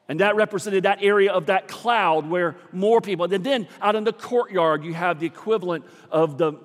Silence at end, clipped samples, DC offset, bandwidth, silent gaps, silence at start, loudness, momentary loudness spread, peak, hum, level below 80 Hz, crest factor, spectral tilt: 0.05 s; under 0.1%; under 0.1%; 14 kHz; none; 0.1 s; -22 LUFS; 6 LU; -4 dBFS; none; -82 dBFS; 18 dB; -5.5 dB/octave